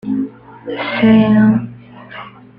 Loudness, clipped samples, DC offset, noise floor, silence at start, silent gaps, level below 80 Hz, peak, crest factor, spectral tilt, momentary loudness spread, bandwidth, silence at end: -13 LUFS; under 0.1%; under 0.1%; -35 dBFS; 0.05 s; none; -46 dBFS; -2 dBFS; 12 dB; -10 dB/octave; 23 LU; 5 kHz; 0.3 s